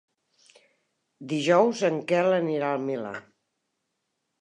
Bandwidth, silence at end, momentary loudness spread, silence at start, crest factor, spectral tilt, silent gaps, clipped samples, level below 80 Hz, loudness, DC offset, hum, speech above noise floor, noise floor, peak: 10.5 kHz; 1.2 s; 16 LU; 1.2 s; 20 dB; -5.5 dB/octave; none; under 0.1%; -82 dBFS; -25 LUFS; under 0.1%; none; 55 dB; -79 dBFS; -8 dBFS